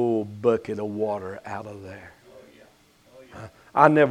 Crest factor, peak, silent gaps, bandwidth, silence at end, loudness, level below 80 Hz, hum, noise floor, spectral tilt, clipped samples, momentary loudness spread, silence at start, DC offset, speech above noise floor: 24 dB; 0 dBFS; none; 11 kHz; 0 s; -24 LUFS; -64 dBFS; none; -57 dBFS; -7.5 dB/octave; under 0.1%; 25 LU; 0 s; under 0.1%; 34 dB